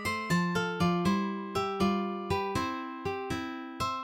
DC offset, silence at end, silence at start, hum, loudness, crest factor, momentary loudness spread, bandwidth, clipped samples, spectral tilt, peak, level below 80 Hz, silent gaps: under 0.1%; 0 s; 0 s; none; -31 LUFS; 16 dB; 7 LU; 16.5 kHz; under 0.1%; -5.5 dB/octave; -16 dBFS; -56 dBFS; none